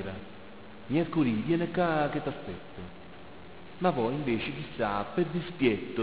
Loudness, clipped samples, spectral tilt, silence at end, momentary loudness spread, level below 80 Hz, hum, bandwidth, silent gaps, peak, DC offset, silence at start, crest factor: -30 LUFS; under 0.1%; -5.5 dB/octave; 0 s; 21 LU; -56 dBFS; none; 4 kHz; none; -14 dBFS; 0.4%; 0 s; 18 dB